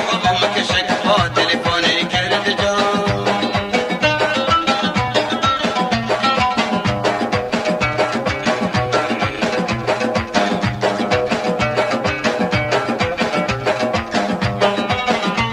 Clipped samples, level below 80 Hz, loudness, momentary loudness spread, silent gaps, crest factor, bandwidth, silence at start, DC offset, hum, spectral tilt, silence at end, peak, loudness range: under 0.1%; -42 dBFS; -17 LUFS; 4 LU; none; 16 dB; 15 kHz; 0 s; under 0.1%; none; -4.5 dB/octave; 0 s; -2 dBFS; 2 LU